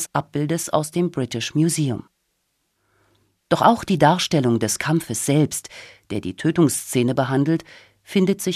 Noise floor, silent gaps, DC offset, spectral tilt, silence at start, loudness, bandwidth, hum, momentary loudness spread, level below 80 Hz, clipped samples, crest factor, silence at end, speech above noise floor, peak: -71 dBFS; none; under 0.1%; -5 dB/octave; 0 s; -21 LUFS; 15 kHz; none; 10 LU; -54 dBFS; under 0.1%; 18 dB; 0 s; 51 dB; -2 dBFS